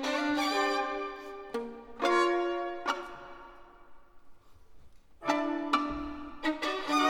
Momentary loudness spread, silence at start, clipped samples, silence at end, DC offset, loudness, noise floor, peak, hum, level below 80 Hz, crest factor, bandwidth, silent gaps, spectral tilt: 16 LU; 0 s; under 0.1%; 0 s; under 0.1%; -32 LUFS; -51 dBFS; -12 dBFS; none; -58 dBFS; 20 dB; 17.5 kHz; none; -3 dB/octave